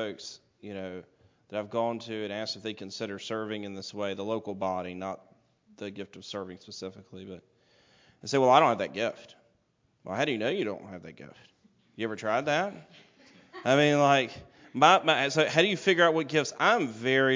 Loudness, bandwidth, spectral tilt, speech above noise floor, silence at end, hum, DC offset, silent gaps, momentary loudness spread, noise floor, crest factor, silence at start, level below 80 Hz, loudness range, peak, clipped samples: -27 LUFS; 7.6 kHz; -4.5 dB/octave; 43 dB; 0 s; none; under 0.1%; none; 22 LU; -71 dBFS; 22 dB; 0 s; -70 dBFS; 12 LU; -6 dBFS; under 0.1%